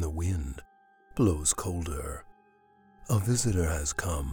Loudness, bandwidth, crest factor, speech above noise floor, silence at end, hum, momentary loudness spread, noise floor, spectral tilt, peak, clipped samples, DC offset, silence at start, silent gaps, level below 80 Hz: -29 LUFS; 19 kHz; 18 dB; 34 dB; 0 s; none; 14 LU; -62 dBFS; -5 dB/octave; -12 dBFS; under 0.1%; under 0.1%; 0 s; none; -42 dBFS